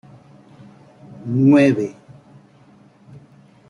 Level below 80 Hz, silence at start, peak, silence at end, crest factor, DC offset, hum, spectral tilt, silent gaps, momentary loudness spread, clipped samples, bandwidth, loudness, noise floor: -64 dBFS; 1.1 s; -4 dBFS; 1.75 s; 18 dB; under 0.1%; none; -8 dB/octave; none; 17 LU; under 0.1%; 10.5 kHz; -16 LUFS; -50 dBFS